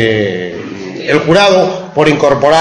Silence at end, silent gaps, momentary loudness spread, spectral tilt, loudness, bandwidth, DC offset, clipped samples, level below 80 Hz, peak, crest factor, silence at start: 0 s; none; 14 LU; -5 dB/octave; -10 LUFS; 10.5 kHz; under 0.1%; 0.5%; -44 dBFS; 0 dBFS; 10 dB; 0 s